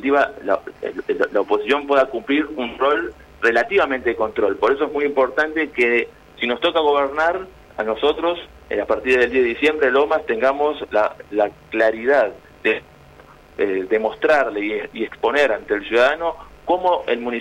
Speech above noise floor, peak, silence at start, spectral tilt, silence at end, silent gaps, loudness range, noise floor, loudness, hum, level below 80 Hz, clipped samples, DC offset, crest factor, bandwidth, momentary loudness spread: 26 dB; -6 dBFS; 0 s; -4.5 dB/octave; 0 s; none; 2 LU; -46 dBFS; -19 LUFS; none; -50 dBFS; under 0.1%; under 0.1%; 14 dB; 10.5 kHz; 9 LU